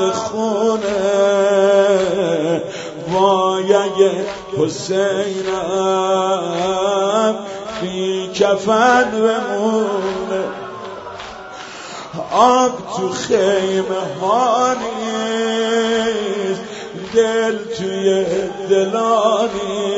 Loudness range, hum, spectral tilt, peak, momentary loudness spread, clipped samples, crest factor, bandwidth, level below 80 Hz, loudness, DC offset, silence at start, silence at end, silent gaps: 3 LU; none; -4 dB/octave; 0 dBFS; 13 LU; under 0.1%; 16 dB; 8 kHz; -54 dBFS; -17 LUFS; under 0.1%; 0 s; 0 s; none